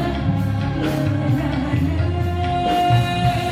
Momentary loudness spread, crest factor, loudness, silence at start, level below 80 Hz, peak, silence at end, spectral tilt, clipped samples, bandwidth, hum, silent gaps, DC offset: 4 LU; 14 dB; -20 LUFS; 0 s; -34 dBFS; -6 dBFS; 0 s; -7 dB/octave; under 0.1%; 16 kHz; none; none; under 0.1%